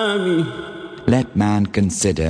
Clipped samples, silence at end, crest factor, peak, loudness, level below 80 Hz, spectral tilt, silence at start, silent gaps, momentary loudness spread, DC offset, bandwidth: under 0.1%; 0 s; 16 dB; -2 dBFS; -19 LUFS; -40 dBFS; -5.5 dB/octave; 0 s; none; 9 LU; under 0.1%; 10 kHz